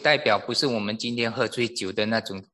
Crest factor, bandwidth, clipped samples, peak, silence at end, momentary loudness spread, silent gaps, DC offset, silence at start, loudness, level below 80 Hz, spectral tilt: 20 dB; 12.5 kHz; under 0.1%; -6 dBFS; 0.1 s; 6 LU; none; under 0.1%; 0 s; -25 LUFS; -62 dBFS; -4 dB/octave